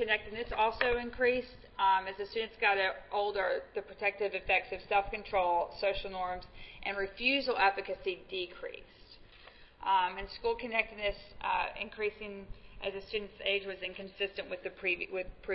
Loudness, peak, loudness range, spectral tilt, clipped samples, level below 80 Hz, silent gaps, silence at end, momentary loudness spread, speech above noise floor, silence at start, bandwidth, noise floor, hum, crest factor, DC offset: -33 LUFS; -14 dBFS; 5 LU; -0.5 dB/octave; under 0.1%; -54 dBFS; none; 0 s; 12 LU; 22 dB; 0 s; 5.6 kHz; -56 dBFS; none; 20 dB; under 0.1%